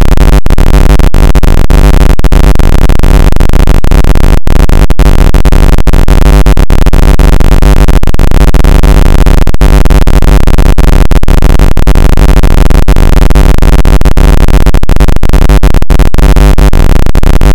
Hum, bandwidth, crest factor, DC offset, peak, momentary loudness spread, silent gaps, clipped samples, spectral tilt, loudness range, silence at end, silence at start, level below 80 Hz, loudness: none; 17 kHz; 0 dB; under 0.1%; 0 dBFS; 2 LU; none; 50%; -6.5 dB/octave; 1 LU; 0 s; 0 s; -2 dBFS; -7 LUFS